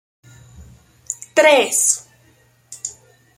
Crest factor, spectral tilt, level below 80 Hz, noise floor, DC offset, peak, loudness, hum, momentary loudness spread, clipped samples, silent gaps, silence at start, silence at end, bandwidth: 20 dB; -0.5 dB/octave; -56 dBFS; -55 dBFS; under 0.1%; -2 dBFS; -15 LUFS; none; 18 LU; under 0.1%; none; 0.6 s; 0.45 s; 16.5 kHz